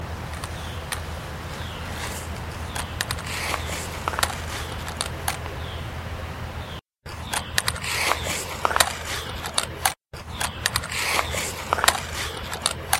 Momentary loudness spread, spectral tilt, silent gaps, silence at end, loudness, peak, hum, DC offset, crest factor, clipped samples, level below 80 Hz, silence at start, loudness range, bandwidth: 12 LU; -2 dB/octave; none; 0 s; -27 LUFS; 0 dBFS; none; under 0.1%; 28 dB; under 0.1%; -40 dBFS; 0 s; 6 LU; 16.5 kHz